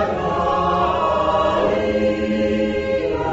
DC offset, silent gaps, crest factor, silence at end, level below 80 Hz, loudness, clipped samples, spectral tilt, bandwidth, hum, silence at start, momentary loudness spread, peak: under 0.1%; none; 14 dB; 0 s; -38 dBFS; -19 LUFS; under 0.1%; -4.5 dB/octave; 8 kHz; none; 0 s; 3 LU; -6 dBFS